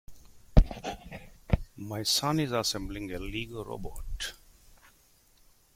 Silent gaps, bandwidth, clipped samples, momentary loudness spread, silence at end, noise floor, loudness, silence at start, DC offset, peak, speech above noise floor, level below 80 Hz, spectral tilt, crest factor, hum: none; 16 kHz; under 0.1%; 15 LU; 1.4 s; -63 dBFS; -31 LUFS; 0.1 s; under 0.1%; -4 dBFS; 30 dB; -34 dBFS; -4.5 dB/octave; 28 dB; none